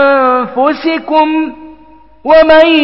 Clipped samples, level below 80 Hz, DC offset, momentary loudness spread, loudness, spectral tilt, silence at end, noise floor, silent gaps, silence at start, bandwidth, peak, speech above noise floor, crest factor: 0.2%; -42 dBFS; 0.7%; 11 LU; -9 LUFS; -6 dB/octave; 0 s; -41 dBFS; none; 0 s; 5.8 kHz; 0 dBFS; 33 dB; 10 dB